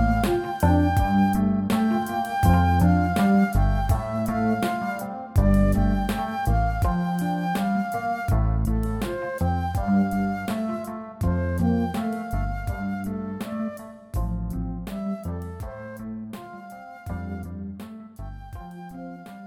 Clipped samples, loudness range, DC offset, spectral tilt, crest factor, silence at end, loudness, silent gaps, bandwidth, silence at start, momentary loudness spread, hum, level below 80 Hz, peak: under 0.1%; 13 LU; under 0.1%; -7.5 dB/octave; 18 dB; 0 s; -24 LUFS; none; 19 kHz; 0 s; 18 LU; none; -32 dBFS; -6 dBFS